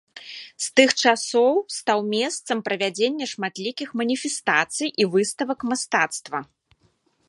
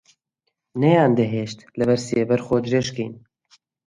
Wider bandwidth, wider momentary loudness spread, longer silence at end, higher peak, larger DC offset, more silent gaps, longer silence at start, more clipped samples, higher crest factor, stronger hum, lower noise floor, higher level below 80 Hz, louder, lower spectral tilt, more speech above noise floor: about the same, 11.5 kHz vs 11.5 kHz; second, 11 LU vs 14 LU; first, 0.85 s vs 0.7 s; about the same, -2 dBFS vs -2 dBFS; neither; neither; second, 0.15 s vs 0.75 s; neither; about the same, 22 dB vs 18 dB; neither; second, -65 dBFS vs -77 dBFS; second, -72 dBFS vs -56 dBFS; about the same, -22 LUFS vs -21 LUFS; second, -2.5 dB/octave vs -6.5 dB/octave; second, 42 dB vs 57 dB